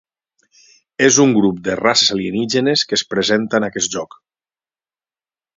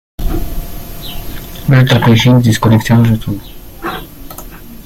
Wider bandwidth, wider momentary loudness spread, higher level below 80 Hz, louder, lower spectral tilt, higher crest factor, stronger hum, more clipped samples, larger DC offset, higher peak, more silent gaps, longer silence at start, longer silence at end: second, 7.8 kHz vs 16.5 kHz; second, 9 LU vs 21 LU; second, -56 dBFS vs -26 dBFS; second, -15 LUFS vs -11 LUFS; second, -3 dB/octave vs -6.5 dB/octave; first, 18 dB vs 12 dB; neither; neither; neither; about the same, 0 dBFS vs 0 dBFS; neither; first, 1 s vs 0.2 s; first, 1.55 s vs 0 s